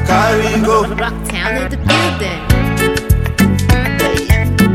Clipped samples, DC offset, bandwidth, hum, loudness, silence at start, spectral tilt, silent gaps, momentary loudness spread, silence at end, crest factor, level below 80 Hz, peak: under 0.1%; under 0.1%; 17 kHz; none; -14 LUFS; 0 s; -5.5 dB/octave; none; 6 LU; 0 s; 12 dB; -20 dBFS; 0 dBFS